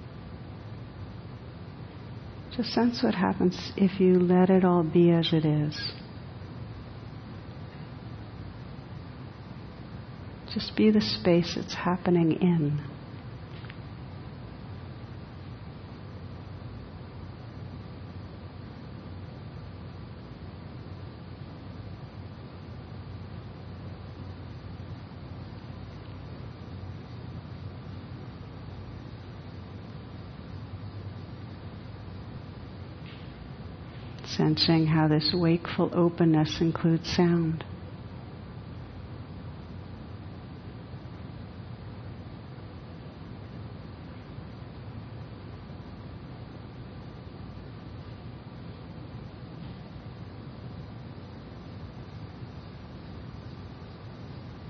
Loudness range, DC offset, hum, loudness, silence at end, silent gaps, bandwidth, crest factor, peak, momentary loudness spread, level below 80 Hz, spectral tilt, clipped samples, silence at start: 18 LU; under 0.1%; none; -27 LUFS; 0 s; none; 6.4 kHz; 20 dB; -10 dBFS; 19 LU; -52 dBFS; -7.5 dB/octave; under 0.1%; 0 s